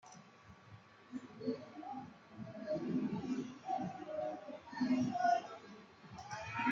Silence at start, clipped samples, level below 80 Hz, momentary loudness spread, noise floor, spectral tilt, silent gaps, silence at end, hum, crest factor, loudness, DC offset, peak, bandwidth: 0.05 s; under 0.1%; -76 dBFS; 23 LU; -60 dBFS; -6 dB/octave; none; 0 s; none; 18 dB; -41 LUFS; under 0.1%; -22 dBFS; 7.6 kHz